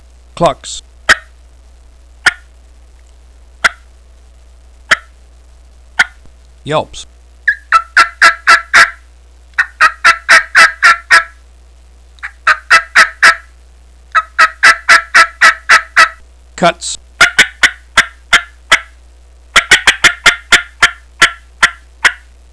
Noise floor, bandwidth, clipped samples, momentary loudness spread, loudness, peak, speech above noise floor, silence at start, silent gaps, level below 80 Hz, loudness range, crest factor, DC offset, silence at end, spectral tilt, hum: -40 dBFS; 11 kHz; 2%; 11 LU; -9 LUFS; 0 dBFS; 25 dB; 0.4 s; none; -38 dBFS; 11 LU; 12 dB; 0.3%; 0.4 s; -0.5 dB/octave; none